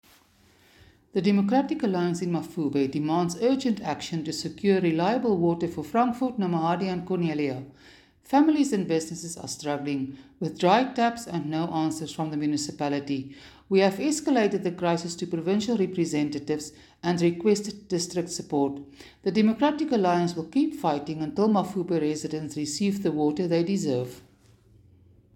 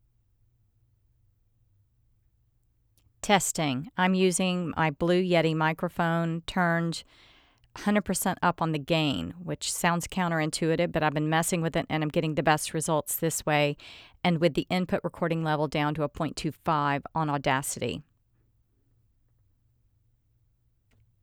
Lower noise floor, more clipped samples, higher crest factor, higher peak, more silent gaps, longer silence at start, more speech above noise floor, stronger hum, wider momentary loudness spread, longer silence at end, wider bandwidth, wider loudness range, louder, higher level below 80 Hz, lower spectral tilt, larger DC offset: second, -60 dBFS vs -69 dBFS; neither; about the same, 18 dB vs 22 dB; about the same, -8 dBFS vs -8 dBFS; neither; second, 1.15 s vs 3.25 s; second, 34 dB vs 42 dB; neither; about the same, 9 LU vs 7 LU; second, 1.15 s vs 3.2 s; about the same, 17 kHz vs 17.5 kHz; second, 2 LU vs 6 LU; about the same, -26 LUFS vs -27 LUFS; second, -64 dBFS vs -56 dBFS; about the same, -5.5 dB/octave vs -4.5 dB/octave; neither